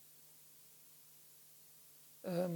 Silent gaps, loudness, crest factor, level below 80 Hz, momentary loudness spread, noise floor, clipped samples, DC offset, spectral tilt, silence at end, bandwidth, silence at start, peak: none; -51 LUFS; 20 dB; under -90 dBFS; 15 LU; -62 dBFS; under 0.1%; under 0.1%; -6.5 dB/octave; 0 s; 19 kHz; 0 s; -26 dBFS